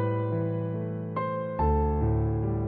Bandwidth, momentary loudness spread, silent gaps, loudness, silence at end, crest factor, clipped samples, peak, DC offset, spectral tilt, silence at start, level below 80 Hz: 3.7 kHz; 6 LU; none; -29 LUFS; 0 s; 12 dB; under 0.1%; -16 dBFS; under 0.1%; -13 dB/octave; 0 s; -34 dBFS